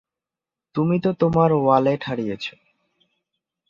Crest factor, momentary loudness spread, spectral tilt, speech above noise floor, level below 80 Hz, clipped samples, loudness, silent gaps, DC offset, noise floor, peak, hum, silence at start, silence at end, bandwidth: 20 dB; 13 LU; -8.5 dB/octave; 69 dB; -56 dBFS; under 0.1%; -21 LUFS; none; under 0.1%; -89 dBFS; -4 dBFS; none; 0.75 s; 1.2 s; 7.2 kHz